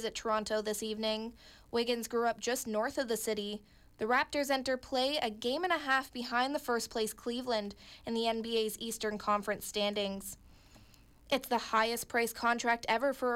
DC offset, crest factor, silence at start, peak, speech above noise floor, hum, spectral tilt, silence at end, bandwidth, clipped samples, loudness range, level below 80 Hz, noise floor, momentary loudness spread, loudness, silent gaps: under 0.1%; 16 dB; 0 s; -18 dBFS; 26 dB; none; -2.5 dB/octave; 0 s; 17 kHz; under 0.1%; 3 LU; -64 dBFS; -60 dBFS; 7 LU; -33 LUFS; none